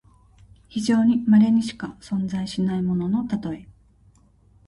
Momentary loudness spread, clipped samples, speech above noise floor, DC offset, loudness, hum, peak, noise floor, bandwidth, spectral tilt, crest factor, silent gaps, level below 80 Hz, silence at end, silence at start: 16 LU; under 0.1%; 35 dB; under 0.1%; -22 LUFS; none; -8 dBFS; -56 dBFS; 11.5 kHz; -7 dB/octave; 14 dB; none; -54 dBFS; 1.05 s; 0.75 s